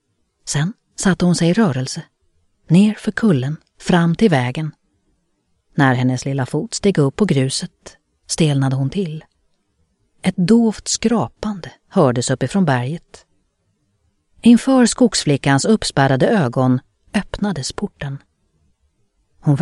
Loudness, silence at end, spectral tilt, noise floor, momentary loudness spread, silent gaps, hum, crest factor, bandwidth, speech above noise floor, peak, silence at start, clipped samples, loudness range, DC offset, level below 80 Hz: -17 LUFS; 0 s; -5.5 dB/octave; -66 dBFS; 13 LU; none; none; 18 dB; 12 kHz; 50 dB; 0 dBFS; 0.45 s; under 0.1%; 5 LU; under 0.1%; -46 dBFS